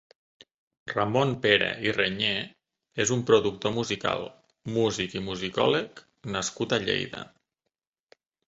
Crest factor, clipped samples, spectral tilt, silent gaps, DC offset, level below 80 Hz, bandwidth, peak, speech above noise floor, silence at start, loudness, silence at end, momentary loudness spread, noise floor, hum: 24 dB; under 0.1%; -4 dB/octave; none; under 0.1%; -60 dBFS; 8 kHz; -4 dBFS; 58 dB; 0.85 s; -26 LUFS; 1.2 s; 19 LU; -85 dBFS; none